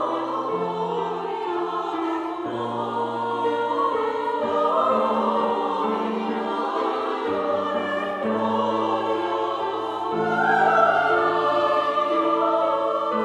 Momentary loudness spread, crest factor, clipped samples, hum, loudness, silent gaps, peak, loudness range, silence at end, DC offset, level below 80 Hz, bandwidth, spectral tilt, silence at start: 7 LU; 18 dB; under 0.1%; none; -23 LUFS; none; -6 dBFS; 5 LU; 0 s; under 0.1%; -70 dBFS; 10.5 kHz; -6 dB/octave; 0 s